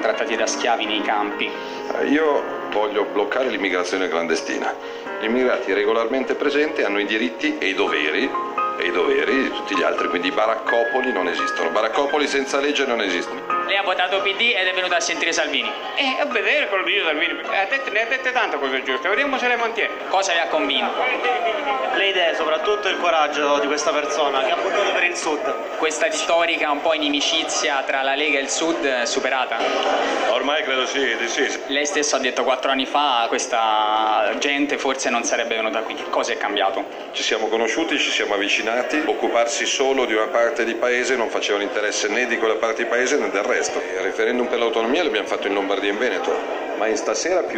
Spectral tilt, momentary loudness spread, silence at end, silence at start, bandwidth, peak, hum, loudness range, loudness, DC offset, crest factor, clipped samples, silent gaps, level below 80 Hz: -1 dB/octave; 4 LU; 0 s; 0 s; 16 kHz; -4 dBFS; none; 2 LU; -20 LUFS; under 0.1%; 16 dB; under 0.1%; none; -60 dBFS